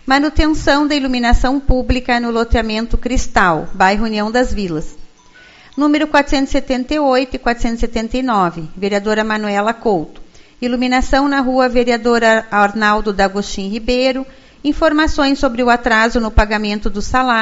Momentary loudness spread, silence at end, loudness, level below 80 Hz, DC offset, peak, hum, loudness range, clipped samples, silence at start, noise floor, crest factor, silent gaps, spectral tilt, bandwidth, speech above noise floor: 7 LU; 0 s; -15 LUFS; -24 dBFS; under 0.1%; 0 dBFS; none; 3 LU; under 0.1%; 0.05 s; -43 dBFS; 14 dB; none; -5 dB/octave; 8 kHz; 29 dB